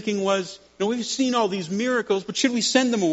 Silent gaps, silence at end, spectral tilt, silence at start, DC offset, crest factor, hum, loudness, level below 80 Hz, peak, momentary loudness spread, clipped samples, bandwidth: none; 0 s; -3 dB/octave; 0 s; under 0.1%; 18 dB; none; -23 LUFS; -68 dBFS; -4 dBFS; 6 LU; under 0.1%; 8 kHz